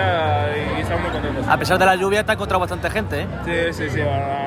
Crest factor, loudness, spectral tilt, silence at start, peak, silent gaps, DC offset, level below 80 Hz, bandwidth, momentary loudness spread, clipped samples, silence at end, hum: 16 dB; -20 LUFS; -5.5 dB/octave; 0 s; -4 dBFS; none; under 0.1%; -36 dBFS; 16 kHz; 8 LU; under 0.1%; 0 s; none